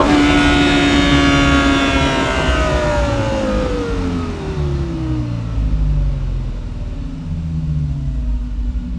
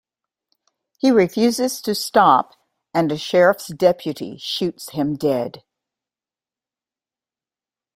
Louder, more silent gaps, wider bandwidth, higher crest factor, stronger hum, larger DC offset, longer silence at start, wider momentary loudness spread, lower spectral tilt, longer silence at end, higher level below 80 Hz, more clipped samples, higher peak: about the same, -17 LUFS vs -19 LUFS; neither; second, 12 kHz vs 16 kHz; about the same, 16 dB vs 20 dB; neither; neither; second, 0 s vs 1.05 s; about the same, 12 LU vs 10 LU; about the same, -5.5 dB/octave vs -5 dB/octave; second, 0 s vs 2.35 s; first, -22 dBFS vs -62 dBFS; neither; about the same, 0 dBFS vs -2 dBFS